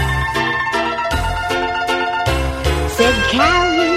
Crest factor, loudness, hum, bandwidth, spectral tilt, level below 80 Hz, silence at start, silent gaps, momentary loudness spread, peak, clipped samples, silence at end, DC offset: 14 dB; -16 LUFS; none; 16 kHz; -4.5 dB/octave; -26 dBFS; 0 s; none; 6 LU; -2 dBFS; under 0.1%; 0 s; under 0.1%